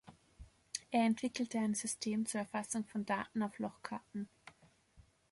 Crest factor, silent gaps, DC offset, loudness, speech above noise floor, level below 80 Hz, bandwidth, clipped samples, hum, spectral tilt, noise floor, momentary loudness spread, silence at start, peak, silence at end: 20 dB; none; under 0.1%; -38 LUFS; 29 dB; -70 dBFS; 11.5 kHz; under 0.1%; none; -4 dB/octave; -67 dBFS; 12 LU; 0.05 s; -20 dBFS; 0.3 s